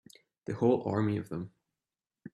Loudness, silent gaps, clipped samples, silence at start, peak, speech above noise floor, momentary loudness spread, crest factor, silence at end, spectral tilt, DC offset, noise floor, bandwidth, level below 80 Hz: -32 LUFS; none; under 0.1%; 0.5 s; -14 dBFS; over 60 dB; 17 LU; 20 dB; 0.05 s; -8.5 dB/octave; under 0.1%; under -90 dBFS; 12 kHz; -68 dBFS